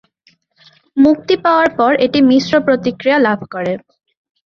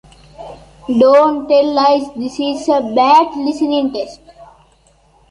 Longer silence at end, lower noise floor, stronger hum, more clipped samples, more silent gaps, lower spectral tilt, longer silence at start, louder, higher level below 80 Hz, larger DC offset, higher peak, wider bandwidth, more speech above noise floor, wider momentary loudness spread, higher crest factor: about the same, 0.75 s vs 0.85 s; first, -56 dBFS vs -52 dBFS; neither; neither; neither; about the same, -6 dB/octave vs -5 dB/octave; first, 0.95 s vs 0.4 s; about the same, -13 LUFS vs -13 LUFS; about the same, -52 dBFS vs -50 dBFS; neither; about the same, -2 dBFS vs -2 dBFS; second, 6.8 kHz vs 10.5 kHz; first, 43 dB vs 39 dB; second, 10 LU vs 19 LU; about the same, 14 dB vs 14 dB